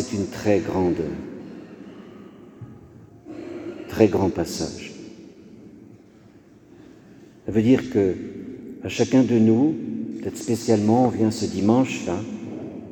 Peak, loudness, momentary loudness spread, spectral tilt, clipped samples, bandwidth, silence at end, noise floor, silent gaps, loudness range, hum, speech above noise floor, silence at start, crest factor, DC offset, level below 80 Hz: -2 dBFS; -22 LUFS; 23 LU; -6.5 dB/octave; under 0.1%; 18.5 kHz; 0 s; -50 dBFS; none; 10 LU; none; 29 dB; 0 s; 22 dB; under 0.1%; -54 dBFS